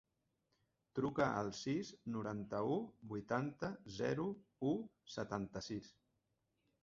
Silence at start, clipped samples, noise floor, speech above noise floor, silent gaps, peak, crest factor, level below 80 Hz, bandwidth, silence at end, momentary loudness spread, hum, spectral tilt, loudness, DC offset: 0.95 s; under 0.1%; -85 dBFS; 43 dB; none; -22 dBFS; 22 dB; -72 dBFS; 7.6 kHz; 0.95 s; 10 LU; none; -5.5 dB/octave; -42 LUFS; under 0.1%